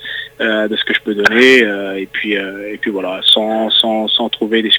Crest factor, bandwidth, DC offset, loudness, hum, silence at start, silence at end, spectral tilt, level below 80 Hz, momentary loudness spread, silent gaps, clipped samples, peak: 14 dB; 20 kHz; under 0.1%; -13 LUFS; none; 0 s; 0 s; -3.5 dB/octave; -56 dBFS; 12 LU; none; 0.2%; 0 dBFS